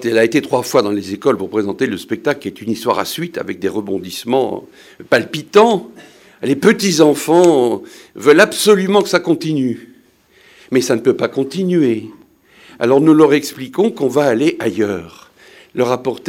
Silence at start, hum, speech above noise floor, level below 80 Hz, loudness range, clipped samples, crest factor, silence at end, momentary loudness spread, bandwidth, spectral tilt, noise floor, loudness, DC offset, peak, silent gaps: 0 s; none; 36 dB; -62 dBFS; 7 LU; under 0.1%; 16 dB; 0 s; 12 LU; 17 kHz; -5 dB/octave; -50 dBFS; -15 LUFS; under 0.1%; 0 dBFS; none